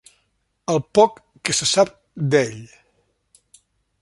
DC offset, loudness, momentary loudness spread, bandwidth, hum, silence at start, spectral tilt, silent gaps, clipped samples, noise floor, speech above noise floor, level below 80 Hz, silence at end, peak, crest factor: under 0.1%; -20 LUFS; 12 LU; 11.5 kHz; none; 0.7 s; -3.5 dB/octave; none; under 0.1%; -69 dBFS; 50 dB; -58 dBFS; 1.35 s; -2 dBFS; 20 dB